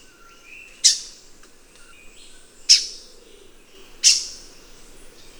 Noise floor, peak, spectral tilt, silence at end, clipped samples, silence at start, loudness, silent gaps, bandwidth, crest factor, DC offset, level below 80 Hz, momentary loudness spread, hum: -47 dBFS; 0 dBFS; 3.5 dB/octave; 1.05 s; under 0.1%; 0.85 s; -16 LUFS; none; over 20 kHz; 26 dB; under 0.1%; -52 dBFS; 26 LU; none